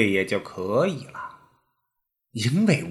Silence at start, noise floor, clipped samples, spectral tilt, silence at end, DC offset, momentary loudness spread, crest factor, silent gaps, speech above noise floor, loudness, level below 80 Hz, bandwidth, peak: 0 s; -80 dBFS; under 0.1%; -6 dB/octave; 0 s; under 0.1%; 17 LU; 20 dB; none; 56 dB; -24 LUFS; -66 dBFS; 13 kHz; -6 dBFS